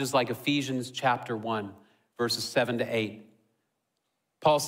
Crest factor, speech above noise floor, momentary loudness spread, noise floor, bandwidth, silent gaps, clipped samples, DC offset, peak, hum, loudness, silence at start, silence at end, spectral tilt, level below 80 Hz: 20 dB; 52 dB; 6 LU; -80 dBFS; 16 kHz; none; under 0.1%; under 0.1%; -10 dBFS; none; -29 LUFS; 0 s; 0 s; -4 dB/octave; -72 dBFS